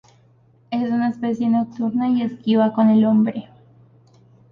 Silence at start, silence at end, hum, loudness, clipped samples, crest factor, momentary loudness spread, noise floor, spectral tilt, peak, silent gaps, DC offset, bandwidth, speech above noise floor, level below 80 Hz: 0.7 s; 1.1 s; none; -19 LUFS; under 0.1%; 14 dB; 8 LU; -55 dBFS; -9 dB/octave; -6 dBFS; none; under 0.1%; 5 kHz; 37 dB; -64 dBFS